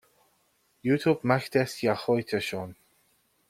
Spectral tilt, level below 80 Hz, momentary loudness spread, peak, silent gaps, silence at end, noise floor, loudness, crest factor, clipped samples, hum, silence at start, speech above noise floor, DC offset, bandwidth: -6 dB/octave; -66 dBFS; 10 LU; -8 dBFS; none; 0.75 s; -69 dBFS; -27 LUFS; 22 dB; under 0.1%; none; 0.85 s; 43 dB; under 0.1%; 16 kHz